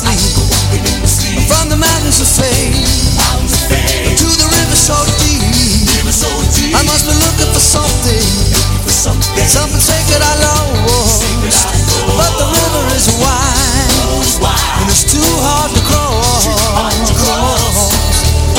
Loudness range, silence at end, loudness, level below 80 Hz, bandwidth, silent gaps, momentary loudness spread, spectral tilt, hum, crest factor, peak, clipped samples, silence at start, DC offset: 1 LU; 0 s; -10 LUFS; -16 dBFS; 17.5 kHz; none; 3 LU; -3 dB/octave; none; 10 dB; 0 dBFS; under 0.1%; 0 s; under 0.1%